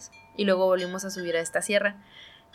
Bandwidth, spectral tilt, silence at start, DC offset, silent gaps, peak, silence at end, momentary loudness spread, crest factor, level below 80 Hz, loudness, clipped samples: 15.5 kHz; -3.5 dB/octave; 0 s; under 0.1%; none; -10 dBFS; 0.25 s; 10 LU; 18 dB; -70 dBFS; -26 LUFS; under 0.1%